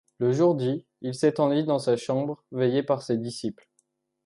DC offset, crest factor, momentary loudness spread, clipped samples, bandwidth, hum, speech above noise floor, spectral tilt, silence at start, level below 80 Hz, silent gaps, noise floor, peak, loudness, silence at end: under 0.1%; 16 dB; 10 LU; under 0.1%; 11.5 kHz; none; 47 dB; -7 dB/octave; 0.2 s; -72 dBFS; none; -72 dBFS; -10 dBFS; -26 LUFS; 0.75 s